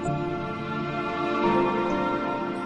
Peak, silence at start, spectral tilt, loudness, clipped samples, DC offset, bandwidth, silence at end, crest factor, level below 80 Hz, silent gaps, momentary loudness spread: -10 dBFS; 0 s; -7 dB/octave; -26 LUFS; under 0.1%; under 0.1%; 8.6 kHz; 0 s; 16 dB; -52 dBFS; none; 7 LU